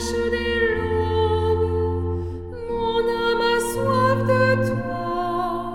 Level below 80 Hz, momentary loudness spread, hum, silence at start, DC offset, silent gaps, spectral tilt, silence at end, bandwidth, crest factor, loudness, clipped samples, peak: -36 dBFS; 7 LU; none; 0 s; under 0.1%; none; -5.5 dB/octave; 0 s; 17 kHz; 14 dB; -22 LUFS; under 0.1%; -6 dBFS